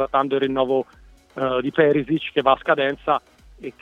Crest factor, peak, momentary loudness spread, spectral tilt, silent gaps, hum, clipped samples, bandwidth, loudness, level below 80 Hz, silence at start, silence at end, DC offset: 20 dB; -2 dBFS; 17 LU; -7.5 dB/octave; none; none; under 0.1%; 7 kHz; -21 LUFS; -52 dBFS; 0 s; 0.1 s; under 0.1%